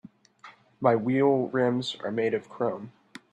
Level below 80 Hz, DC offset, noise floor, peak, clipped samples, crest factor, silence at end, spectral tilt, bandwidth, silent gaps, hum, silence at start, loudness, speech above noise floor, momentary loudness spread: -72 dBFS; under 0.1%; -53 dBFS; -8 dBFS; under 0.1%; 20 dB; 0.4 s; -7 dB/octave; 9.6 kHz; none; none; 0.45 s; -26 LUFS; 27 dB; 8 LU